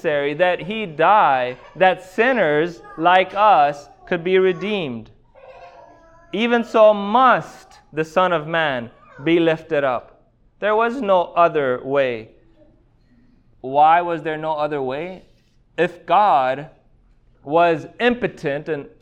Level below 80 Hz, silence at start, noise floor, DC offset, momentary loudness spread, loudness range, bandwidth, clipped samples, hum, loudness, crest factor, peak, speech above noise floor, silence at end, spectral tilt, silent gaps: -56 dBFS; 0.05 s; -55 dBFS; under 0.1%; 13 LU; 4 LU; 9.2 kHz; under 0.1%; none; -18 LUFS; 18 dB; -2 dBFS; 37 dB; 0.15 s; -6 dB/octave; none